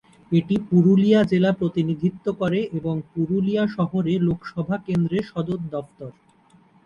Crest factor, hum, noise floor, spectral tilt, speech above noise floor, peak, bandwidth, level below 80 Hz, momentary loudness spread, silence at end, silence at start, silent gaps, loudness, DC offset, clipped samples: 16 dB; none; -56 dBFS; -9 dB/octave; 35 dB; -6 dBFS; 7 kHz; -54 dBFS; 11 LU; 0.75 s; 0.3 s; none; -22 LUFS; under 0.1%; under 0.1%